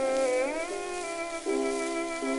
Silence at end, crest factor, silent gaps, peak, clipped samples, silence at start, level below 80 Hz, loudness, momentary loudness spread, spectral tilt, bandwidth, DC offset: 0 s; 12 dB; none; -18 dBFS; under 0.1%; 0 s; -58 dBFS; -30 LUFS; 7 LU; -2 dB/octave; 11.5 kHz; under 0.1%